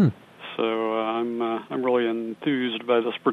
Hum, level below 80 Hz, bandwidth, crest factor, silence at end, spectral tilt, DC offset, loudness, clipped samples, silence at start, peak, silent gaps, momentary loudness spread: none; -72 dBFS; 4.8 kHz; 16 dB; 0 s; -8.5 dB/octave; under 0.1%; -25 LUFS; under 0.1%; 0 s; -8 dBFS; none; 5 LU